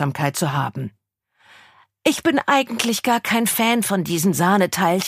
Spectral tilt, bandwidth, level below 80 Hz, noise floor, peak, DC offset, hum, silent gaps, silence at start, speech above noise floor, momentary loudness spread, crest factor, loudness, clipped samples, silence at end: -4 dB/octave; 15.5 kHz; -60 dBFS; -63 dBFS; -2 dBFS; under 0.1%; none; none; 0 s; 44 dB; 6 LU; 18 dB; -19 LUFS; under 0.1%; 0 s